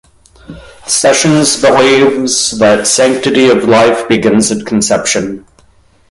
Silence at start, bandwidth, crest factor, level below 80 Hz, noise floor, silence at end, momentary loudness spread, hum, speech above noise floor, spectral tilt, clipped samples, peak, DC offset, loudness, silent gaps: 0.5 s; 11.5 kHz; 10 dB; -44 dBFS; -47 dBFS; 0.7 s; 6 LU; none; 38 dB; -3.5 dB/octave; under 0.1%; 0 dBFS; under 0.1%; -9 LUFS; none